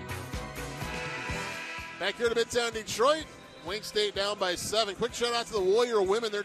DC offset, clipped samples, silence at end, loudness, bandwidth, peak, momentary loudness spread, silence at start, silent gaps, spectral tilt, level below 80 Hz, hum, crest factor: under 0.1%; under 0.1%; 0 s; -30 LUFS; 14.5 kHz; -12 dBFS; 11 LU; 0 s; none; -3 dB/octave; -52 dBFS; none; 18 dB